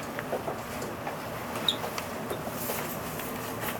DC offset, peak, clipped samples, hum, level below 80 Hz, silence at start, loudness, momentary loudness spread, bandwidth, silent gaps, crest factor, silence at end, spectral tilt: under 0.1%; -10 dBFS; under 0.1%; none; -56 dBFS; 0 s; -33 LUFS; 7 LU; over 20 kHz; none; 24 dB; 0 s; -3.5 dB/octave